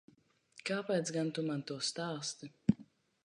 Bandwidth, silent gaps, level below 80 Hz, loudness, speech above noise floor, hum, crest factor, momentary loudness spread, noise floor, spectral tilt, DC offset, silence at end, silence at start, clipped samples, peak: 10.5 kHz; none; -68 dBFS; -37 LUFS; 31 dB; none; 24 dB; 7 LU; -67 dBFS; -4.5 dB/octave; under 0.1%; 0.4 s; 0.55 s; under 0.1%; -14 dBFS